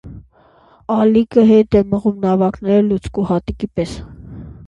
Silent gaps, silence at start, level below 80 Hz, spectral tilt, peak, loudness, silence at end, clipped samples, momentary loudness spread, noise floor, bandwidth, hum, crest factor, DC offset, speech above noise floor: none; 0.05 s; -38 dBFS; -8.5 dB/octave; 0 dBFS; -15 LUFS; 0 s; under 0.1%; 22 LU; -50 dBFS; 9 kHz; none; 16 dB; under 0.1%; 35 dB